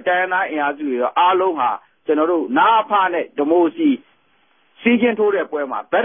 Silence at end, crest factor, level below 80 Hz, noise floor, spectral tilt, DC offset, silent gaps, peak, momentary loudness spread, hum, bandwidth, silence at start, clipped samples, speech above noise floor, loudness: 0 s; 14 dB; -68 dBFS; -60 dBFS; -9.5 dB/octave; under 0.1%; none; -4 dBFS; 7 LU; none; 3.7 kHz; 0 s; under 0.1%; 43 dB; -18 LUFS